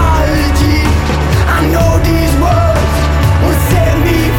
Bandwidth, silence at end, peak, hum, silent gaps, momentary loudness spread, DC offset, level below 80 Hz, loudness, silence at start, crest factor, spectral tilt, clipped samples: 18 kHz; 0 s; 0 dBFS; none; none; 2 LU; under 0.1%; -14 dBFS; -11 LUFS; 0 s; 8 dB; -6 dB/octave; under 0.1%